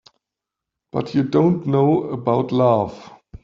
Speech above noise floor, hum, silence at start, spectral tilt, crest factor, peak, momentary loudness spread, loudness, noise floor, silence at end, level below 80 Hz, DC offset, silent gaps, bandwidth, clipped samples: 67 dB; none; 0.95 s; -9.5 dB/octave; 16 dB; -4 dBFS; 9 LU; -19 LUFS; -85 dBFS; 0.1 s; -54 dBFS; under 0.1%; none; 7.4 kHz; under 0.1%